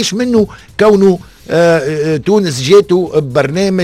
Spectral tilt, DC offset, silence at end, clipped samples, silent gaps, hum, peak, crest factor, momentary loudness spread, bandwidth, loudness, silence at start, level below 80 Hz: -5.5 dB/octave; under 0.1%; 0 s; 0.2%; none; none; 0 dBFS; 10 dB; 6 LU; 14 kHz; -11 LUFS; 0 s; -42 dBFS